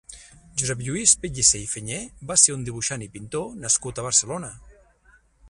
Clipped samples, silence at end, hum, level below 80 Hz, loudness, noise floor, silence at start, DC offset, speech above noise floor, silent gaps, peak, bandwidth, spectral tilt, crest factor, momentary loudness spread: under 0.1%; 0 s; none; -50 dBFS; -21 LUFS; -58 dBFS; 0.1 s; under 0.1%; 34 dB; none; 0 dBFS; 11.5 kHz; -2 dB/octave; 24 dB; 15 LU